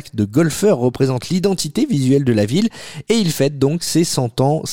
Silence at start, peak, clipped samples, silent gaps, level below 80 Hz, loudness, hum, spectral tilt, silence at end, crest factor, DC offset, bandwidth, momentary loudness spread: 0.05 s; -4 dBFS; under 0.1%; none; -50 dBFS; -17 LUFS; none; -5.5 dB/octave; 0 s; 12 dB; 0.8%; 17 kHz; 4 LU